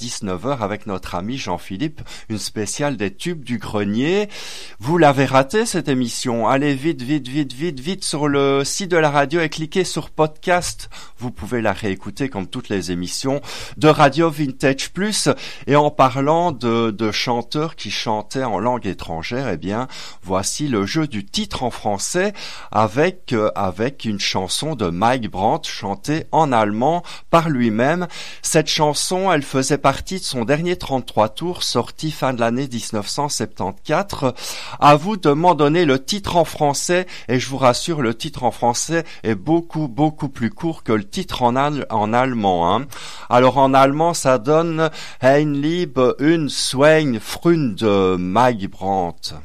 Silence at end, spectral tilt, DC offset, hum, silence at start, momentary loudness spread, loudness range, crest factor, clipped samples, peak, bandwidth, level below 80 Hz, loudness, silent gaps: 0 s; -4.5 dB/octave; 2%; none; 0 s; 10 LU; 6 LU; 16 dB; under 0.1%; -2 dBFS; 15.5 kHz; -46 dBFS; -19 LUFS; none